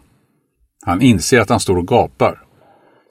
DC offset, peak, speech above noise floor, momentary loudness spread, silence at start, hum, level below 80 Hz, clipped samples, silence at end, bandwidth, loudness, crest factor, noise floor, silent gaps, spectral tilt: under 0.1%; 0 dBFS; 49 dB; 7 LU; 0.85 s; none; -42 dBFS; under 0.1%; 0.75 s; 16 kHz; -14 LUFS; 16 dB; -62 dBFS; none; -5 dB/octave